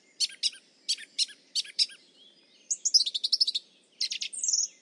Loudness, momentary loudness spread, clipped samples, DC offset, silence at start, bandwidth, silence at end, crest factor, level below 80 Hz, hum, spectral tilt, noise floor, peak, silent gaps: -27 LUFS; 10 LU; under 0.1%; under 0.1%; 0.2 s; 11.5 kHz; 0.15 s; 22 dB; under -90 dBFS; none; 5.5 dB/octave; -59 dBFS; -8 dBFS; none